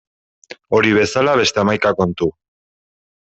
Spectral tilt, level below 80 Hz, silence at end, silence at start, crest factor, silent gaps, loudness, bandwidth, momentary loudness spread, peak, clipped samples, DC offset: -4.5 dB/octave; -52 dBFS; 1.05 s; 0.7 s; 16 dB; none; -16 LUFS; 8.2 kHz; 6 LU; -2 dBFS; under 0.1%; under 0.1%